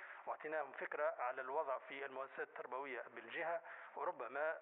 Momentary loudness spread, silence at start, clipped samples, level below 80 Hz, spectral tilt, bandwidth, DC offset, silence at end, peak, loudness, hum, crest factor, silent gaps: 7 LU; 0 s; under 0.1%; under -90 dBFS; 4 dB/octave; 3.9 kHz; under 0.1%; 0 s; -28 dBFS; -45 LUFS; none; 16 dB; none